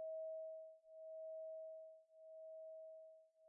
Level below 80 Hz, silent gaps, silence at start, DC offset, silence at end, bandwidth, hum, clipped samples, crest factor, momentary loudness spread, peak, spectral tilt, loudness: under -90 dBFS; none; 0 s; under 0.1%; 0 s; 0.9 kHz; none; under 0.1%; 10 dB; 12 LU; -44 dBFS; 28.5 dB/octave; -54 LUFS